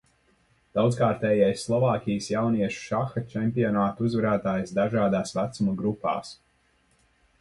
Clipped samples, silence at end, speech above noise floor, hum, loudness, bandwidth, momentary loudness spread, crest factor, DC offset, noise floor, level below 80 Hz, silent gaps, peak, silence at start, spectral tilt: under 0.1%; 1.05 s; 41 dB; none; -26 LUFS; 11.5 kHz; 6 LU; 18 dB; under 0.1%; -66 dBFS; -58 dBFS; none; -8 dBFS; 0.75 s; -7 dB/octave